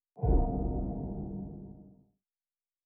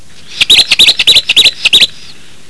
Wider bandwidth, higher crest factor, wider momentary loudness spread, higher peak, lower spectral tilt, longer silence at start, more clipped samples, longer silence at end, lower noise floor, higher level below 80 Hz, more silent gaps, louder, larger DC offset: second, 1.6 kHz vs 11 kHz; first, 18 dB vs 10 dB; first, 19 LU vs 5 LU; second, -16 dBFS vs 0 dBFS; first, -12 dB/octave vs 1 dB/octave; second, 0.15 s vs 0.3 s; second, under 0.1% vs 4%; first, 0.95 s vs 0.65 s; first, under -90 dBFS vs -35 dBFS; about the same, -36 dBFS vs -40 dBFS; neither; second, -34 LUFS vs -4 LUFS; second, under 0.1% vs 4%